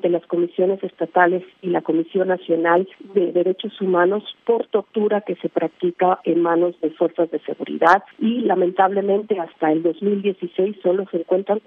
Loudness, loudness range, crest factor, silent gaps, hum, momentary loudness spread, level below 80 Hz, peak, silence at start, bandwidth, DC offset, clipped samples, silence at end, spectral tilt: -20 LUFS; 1 LU; 18 dB; none; none; 6 LU; -74 dBFS; 0 dBFS; 0.05 s; 6.4 kHz; under 0.1%; under 0.1%; 0.05 s; -8 dB/octave